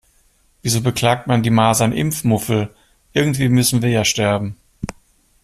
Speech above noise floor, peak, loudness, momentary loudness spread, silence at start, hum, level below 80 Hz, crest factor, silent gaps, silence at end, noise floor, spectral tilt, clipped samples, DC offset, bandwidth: 41 dB; -2 dBFS; -17 LUFS; 15 LU; 0.65 s; none; -46 dBFS; 16 dB; none; 0.5 s; -57 dBFS; -5 dB/octave; under 0.1%; under 0.1%; 15.5 kHz